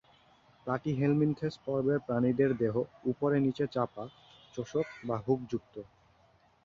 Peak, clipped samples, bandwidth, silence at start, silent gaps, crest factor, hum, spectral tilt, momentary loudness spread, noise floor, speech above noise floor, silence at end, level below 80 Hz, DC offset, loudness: -16 dBFS; under 0.1%; 7.2 kHz; 0.65 s; none; 16 dB; none; -8.5 dB/octave; 16 LU; -66 dBFS; 35 dB; 0.8 s; -64 dBFS; under 0.1%; -32 LUFS